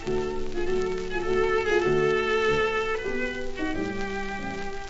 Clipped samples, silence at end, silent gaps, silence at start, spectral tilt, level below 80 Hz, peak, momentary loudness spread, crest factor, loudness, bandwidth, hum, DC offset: under 0.1%; 0 s; none; 0 s; -5 dB/octave; -38 dBFS; -12 dBFS; 8 LU; 14 dB; -27 LUFS; 8 kHz; none; under 0.1%